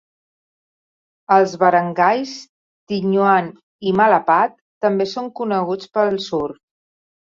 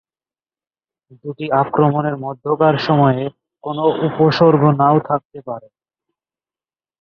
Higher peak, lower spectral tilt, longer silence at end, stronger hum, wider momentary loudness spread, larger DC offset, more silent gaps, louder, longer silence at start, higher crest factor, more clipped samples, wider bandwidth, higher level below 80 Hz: about the same, -2 dBFS vs -2 dBFS; second, -6 dB/octave vs -9 dB/octave; second, 0.85 s vs 1.4 s; neither; second, 11 LU vs 18 LU; neither; first, 2.49-2.87 s, 3.63-3.79 s, 4.61-4.81 s vs 5.25-5.30 s; about the same, -18 LUFS vs -16 LUFS; about the same, 1.3 s vs 1.25 s; about the same, 18 dB vs 16 dB; neither; first, 7.6 kHz vs 6.6 kHz; about the same, -62 dBFS vs -58 dBFS